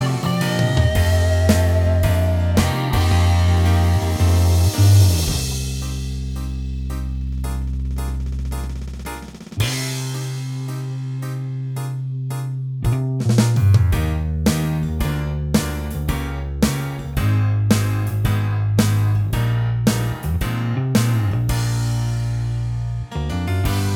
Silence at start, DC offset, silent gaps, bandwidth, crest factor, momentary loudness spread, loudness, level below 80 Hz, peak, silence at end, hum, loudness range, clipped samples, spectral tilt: 0 s; under 0.1%; none; 17 kHz; 18 dB; 10 LU; -20 LUFS; -28 dBFS; -2 dBFS; 0 s; none; 9 LU; under 0.1%; -6 dB/octave